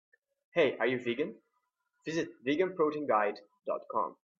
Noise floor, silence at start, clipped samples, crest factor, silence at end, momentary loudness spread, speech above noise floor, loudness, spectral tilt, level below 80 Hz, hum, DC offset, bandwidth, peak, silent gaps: -81 dBFS; 0.55 s; under 0.1%; 20 dB; 0.25 s; 10 LU; 49 dB; -32 LUFS; -5.5 dB/octave; -78 dBFS; none; under 0.1%; 7.6 kHz; -14 dBFS; none